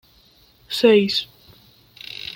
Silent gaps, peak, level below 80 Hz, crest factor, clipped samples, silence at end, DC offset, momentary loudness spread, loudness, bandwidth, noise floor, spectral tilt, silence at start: none; -2 dBFS; -60 dBFS; 20 dB; under 0.1%; 0 s; under 0.1%; 23 LU; -18 LUFS; 17 kHz; -55 dBFS; -5 dB/octave; 0.7 s